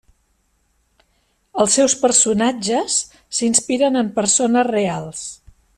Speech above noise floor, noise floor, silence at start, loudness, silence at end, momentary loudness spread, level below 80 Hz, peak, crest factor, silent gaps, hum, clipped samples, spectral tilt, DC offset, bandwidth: 47 dB; -64 dBFS; 1.55 s; -17 LUFS; 0.45 s; 13 LU; -56 dBFS; -2 dBFS; 18 dB; none; none; under 0.1%; -2.5 dB/octave; under 0.1%; 13 kHz